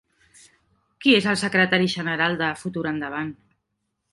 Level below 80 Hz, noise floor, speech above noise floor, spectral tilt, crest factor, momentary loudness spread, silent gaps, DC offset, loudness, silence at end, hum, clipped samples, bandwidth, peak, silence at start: -62 dBFS; -77 dBFS; 55 dB; -4.5 dB/octave; 20 dB; 11 LU; none; under 0.1%; -22 LUFS; 0.8 s; none; under 0.1%; 11.5 kHz; -4 dBFS; 1 s